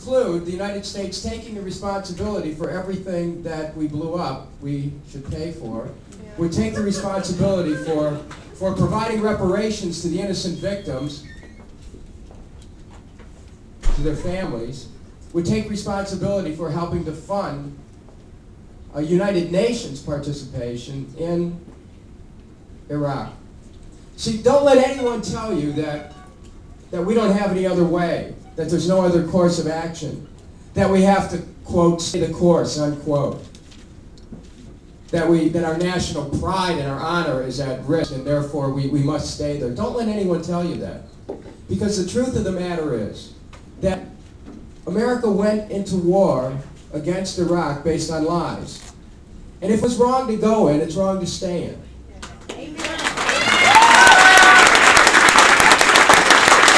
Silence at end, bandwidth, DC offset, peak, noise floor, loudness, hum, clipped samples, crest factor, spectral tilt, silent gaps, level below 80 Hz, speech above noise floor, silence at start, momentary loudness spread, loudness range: 0 s; 11 kHz; under 0.1%; 0 dBFS; -43 dBFS; -18 LUFS; none; under 0.1%; 20 dB; -4 dB/octave; none; -38 dBFS; 22 dB; 0 s; 21 LU; 11 LU